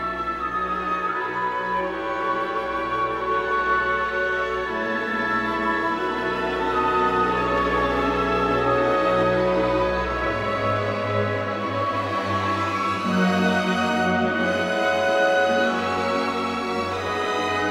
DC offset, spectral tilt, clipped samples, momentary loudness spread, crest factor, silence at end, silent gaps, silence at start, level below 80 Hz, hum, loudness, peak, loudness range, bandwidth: under 0.1%; -5.5 dB/octave; under 0.1%; 5 LU; 14 dB; 0 s; none; 0 s; -44 dBFS; none; -22 LUFS; -8 dBFS; 3 LU; 15.5 kHz